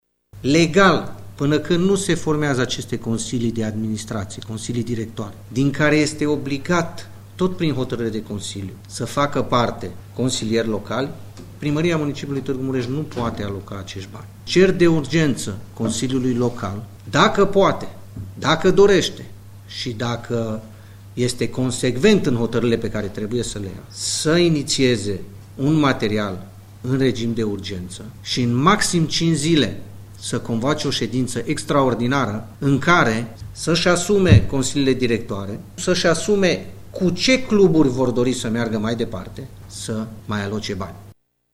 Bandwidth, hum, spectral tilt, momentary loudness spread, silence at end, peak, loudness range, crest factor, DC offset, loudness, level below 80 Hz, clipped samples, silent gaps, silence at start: 16 kHz; none; -5 dB/octave; 16 LU; 0.4 s; 0 dBFS; 5 LU; 20 dB; under 0.1%; -20 LUFS; -42 dBFS; under 0.1%; none; 0.35 s